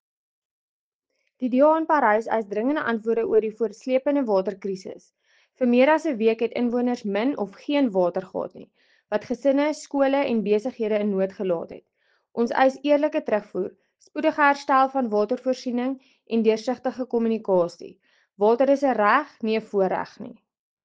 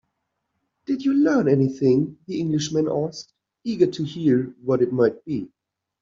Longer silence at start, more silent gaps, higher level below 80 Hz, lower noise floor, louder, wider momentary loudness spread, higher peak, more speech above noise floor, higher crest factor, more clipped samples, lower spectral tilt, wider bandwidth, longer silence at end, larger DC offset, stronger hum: first, 1.4 s vs 0.9 s; neither; second, -70 dBFS vs -64 dBFS; about the same, -76 dBFS vs -77 dBFS; about the same, -23 LUFS vs -22 LUFS; about the same, 12 LU vs 12 LU; about the same, -4 dBFS vs -6 dBFS; about the same, 53 dB vs 56 dB; about the same, 18 dB vs 16 dB; neither; about the same, -6 dB/octave vs -7 dB/octave; first, 9 kHz vs 7.6 kHz; about the same, 0.55 s vs 0.55 s; neither; neither